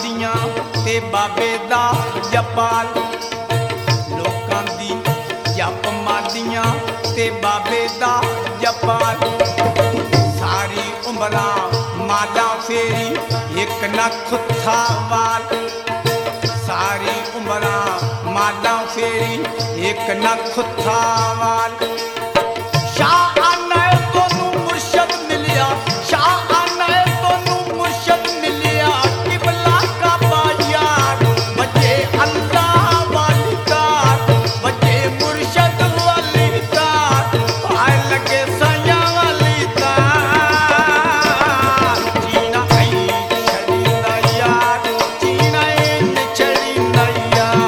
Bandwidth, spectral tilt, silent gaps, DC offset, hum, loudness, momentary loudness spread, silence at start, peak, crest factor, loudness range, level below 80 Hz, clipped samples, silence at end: 18.5 kHz; -4.5 dB/octave; none; under 0.1%; none; -16 LUFS; 7 LU; 0 s; 0 dBFS; 16 dB; 5 LU; -48 dBFS; under 0.1%; 0 s